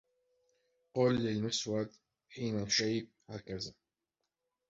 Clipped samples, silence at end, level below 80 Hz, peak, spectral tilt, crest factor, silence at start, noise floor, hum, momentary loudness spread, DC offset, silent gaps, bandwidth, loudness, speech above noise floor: under 0.1%; 1 s; -68 dBFS; -18 dBFS; -4.5 dB/octave; 20 dB; 0.95 s; -88 dBFS; none; 14 LU; under 0.1%; none; 7.6 kHz; -35 LUFS; 54 dB